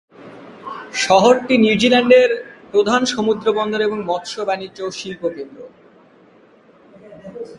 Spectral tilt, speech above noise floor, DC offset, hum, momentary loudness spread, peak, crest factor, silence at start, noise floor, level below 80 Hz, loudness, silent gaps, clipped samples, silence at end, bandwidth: -4 dB/octave; 33 dB; under 0.1%; none; 20 LU; 0 dBFS; 18 dB; 0.2 s; -49 dBFS; -58 dBFS; -17 LUFS; none; under 0.1%; 0 s; 11.5 kHz